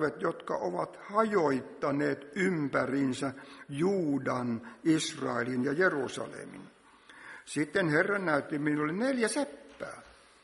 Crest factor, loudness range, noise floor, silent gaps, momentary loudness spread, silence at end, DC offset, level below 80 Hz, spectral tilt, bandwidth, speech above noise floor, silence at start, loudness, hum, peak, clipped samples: 20 dB; 1 LU; -55 dBFS; none; 16 LU; 0.35 s; under 0.1%; -72 dBFS; -5.5 dB/octave; 11.5 kHz; 24 dB; 0 s; -31 LUFS; none; -12 dBFS; under 0.1%